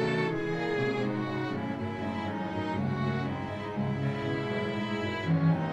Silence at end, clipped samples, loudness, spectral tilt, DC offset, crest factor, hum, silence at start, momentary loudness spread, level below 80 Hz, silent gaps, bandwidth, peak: 0 s; under 0.1%; -31 LUFS; -7.5 dB/octave; under 0.1%; 14 dB; none; 0 s; 5 LU; -58 dBFS; none; 8.6 kHz; -16 dBFS